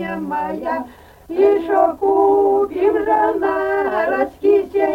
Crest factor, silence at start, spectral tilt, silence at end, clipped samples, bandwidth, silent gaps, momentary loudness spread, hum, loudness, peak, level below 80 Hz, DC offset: 14 dB; 0 s; -7 dB/octave; 0 s; under 0.1%; 5.2 kHz; none; 9 LU; none; -17 LUFS; -2 dBFS; -50 dBFS; under 0.1%